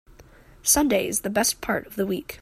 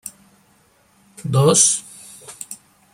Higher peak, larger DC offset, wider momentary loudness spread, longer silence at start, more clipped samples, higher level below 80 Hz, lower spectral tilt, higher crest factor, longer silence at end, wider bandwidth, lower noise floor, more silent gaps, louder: second, -6 dBFS vs 0 dBFS; neither; second, 9 LU vs 25 LU; first, 0.2 s vs 0.05 s; neither; first, -48 dBFS vs -60 dBFS; second, -2.5 dB/octave vs -4 dB/octave; about the same, 20 dB vs 22 dB; second, 0.05 s vs 0.4 s; about the same, 16 kHz vs 16.5 kHz; second, -50 dBFS vs -57 dBFS; neither; second, -23 LUFS vs -15 LUFS